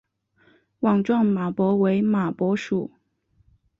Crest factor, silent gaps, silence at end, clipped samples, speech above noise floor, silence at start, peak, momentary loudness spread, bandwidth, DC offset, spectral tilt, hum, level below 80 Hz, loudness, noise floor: 14 dB; none; 0.95 s; under 0.1%; 44 dB; 0.8 s; -10 dBFS; 7 LU; 7.2 kHz; under 0.1%; -8.5 dB/octave; none; -64 dBFS; -22 LUFS; -65 dBFS